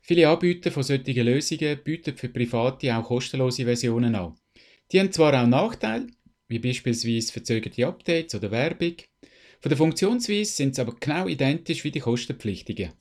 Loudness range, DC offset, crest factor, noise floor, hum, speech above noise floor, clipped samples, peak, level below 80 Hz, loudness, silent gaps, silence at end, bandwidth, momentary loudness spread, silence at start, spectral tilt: 3 LU; under 0.1%; 20 dB; -54 dBFS; none; 30 dB; under 0.1%; -4 dBFS; -56 dBFS; -25 LUFS; none; 0.1 s; 14 kHz; 11 LU; 0.1 s; -5.5 dB/octave